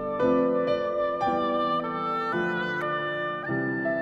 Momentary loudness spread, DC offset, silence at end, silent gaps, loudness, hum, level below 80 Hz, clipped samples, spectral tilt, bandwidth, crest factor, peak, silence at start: 5 LU; under 0.1%; 0 s; none; -27 LUFS; none; -58 dBFS; under 0.1%; -7 dB/octave; 7.4 kHz; 14 dB; -12 dBFS; 0 s